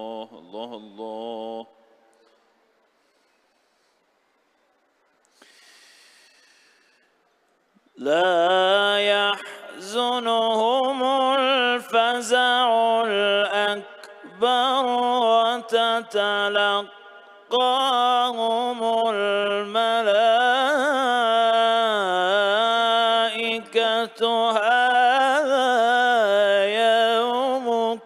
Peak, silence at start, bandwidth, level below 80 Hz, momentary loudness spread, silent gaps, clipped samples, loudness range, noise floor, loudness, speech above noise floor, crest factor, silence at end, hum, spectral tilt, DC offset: -8 dBFS; 0 s; 13.5 kHz; -82 dBFS; 13 LU; none; under 0.1%; 5 LU; -66 dBFS; -20 LUFS; 45 dB; 14 dB; 0 s; none; -2.5 dB/octave; under 0.1%